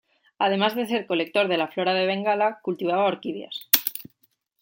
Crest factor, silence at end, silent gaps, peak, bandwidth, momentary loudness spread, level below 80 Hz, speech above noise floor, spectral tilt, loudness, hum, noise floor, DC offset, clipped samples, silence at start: 24 dB; 0.6 s; none; 0 dBFS; 17 kHz; 10 LU; -76 dBFS; 43 dB; -3.5 dB/octave; -24 LUFS; none; -67 dBFS; under 0.1%; under 0.1%; 0.4 s